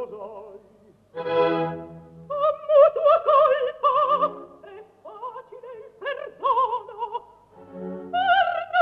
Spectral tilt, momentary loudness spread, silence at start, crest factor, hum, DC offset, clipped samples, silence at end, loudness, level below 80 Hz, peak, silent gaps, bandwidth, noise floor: -7 dB/octave; 23 LU; 0 s; 18 dB; 50 Hz at -70 dBFS; under 0.1%; under 0.1%; 0 s; -22 LUFS; -68 dBFS; -6 dBFS; none; 5.4 kHz; -55 dBFS